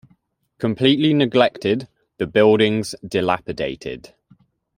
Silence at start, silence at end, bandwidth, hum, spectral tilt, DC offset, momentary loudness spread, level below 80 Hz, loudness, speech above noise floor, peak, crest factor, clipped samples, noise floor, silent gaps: 0.6 s; 0.8 s; 16 kHz; none; -6 dB/octave; under 0.1%; 12 LU; -54 dBFS; -19 LUFS; 43 dB; 0 dBFS; 20 dB; under 0.1%; -61 dBFS; none